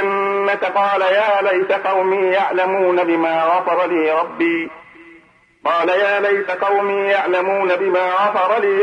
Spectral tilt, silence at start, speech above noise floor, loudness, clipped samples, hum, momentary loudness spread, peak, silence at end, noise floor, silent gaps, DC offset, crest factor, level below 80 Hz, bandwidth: -5.5 dB/octave; 0 s; 33 dB; -16 LUFS; under 0.1%; none; 3 LU; -4 dBFS; 0 s; -50 dBFS; none; under 0.1%; 12 dB; -68 dBFS; 9.6 kHz